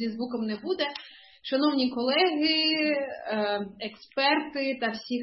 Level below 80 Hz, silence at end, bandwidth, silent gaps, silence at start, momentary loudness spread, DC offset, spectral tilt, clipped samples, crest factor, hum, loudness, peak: -72 dBFS; 0 s; 6 kHz; none; 0 s; 10 LU; under 0.1%; -5.5 dB/octave; under 0.1%; 18 dB; none; -27 LUFS; -10 dBFS